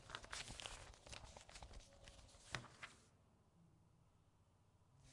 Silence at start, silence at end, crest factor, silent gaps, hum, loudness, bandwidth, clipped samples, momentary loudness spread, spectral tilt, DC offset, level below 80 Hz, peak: 0 s; 0 s; 36 dB; none; none; -55 LUFS; 12 kHz; under 0.1%; 12 LU; -2 dB/octave; under 0.1%; -68 dBFS; -24 dBFS